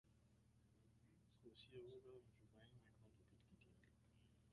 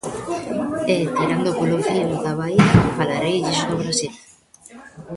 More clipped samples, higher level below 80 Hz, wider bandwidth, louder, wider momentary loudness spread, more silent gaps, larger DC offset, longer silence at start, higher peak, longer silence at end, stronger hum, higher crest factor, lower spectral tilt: neither; second, -82 dBFS vs -42 dBFS; about the same, 11 kHz vs 11.5 kHz; second, -64 LUFS vs -20 LUFS; second, 7 LU vs 10 LU; neither; neither; about the same, 0.05 s vs 0.05 s; second, -48 dBFS vs 0 dBFS; about the same, 0 s vs 0 s; neither; about the same, 20 dB vs 20 dB; about the same, -6.5 dB/octave vs -5.5 dB/octave